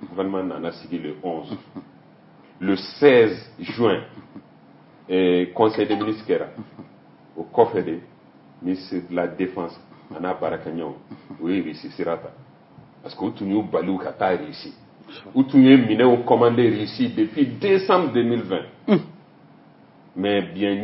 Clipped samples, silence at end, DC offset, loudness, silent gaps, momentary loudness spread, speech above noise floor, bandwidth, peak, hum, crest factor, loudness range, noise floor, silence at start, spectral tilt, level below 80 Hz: under 0.1%; 0 s; under 0.1%; -21 LUFS; none; 21 LU; 29 dB; 5.8 kHz; 0 dBFS; none; 22 dB; 11 LU; -50 dBFS; 0 s; -10.5 dB/octave; -66 dBFS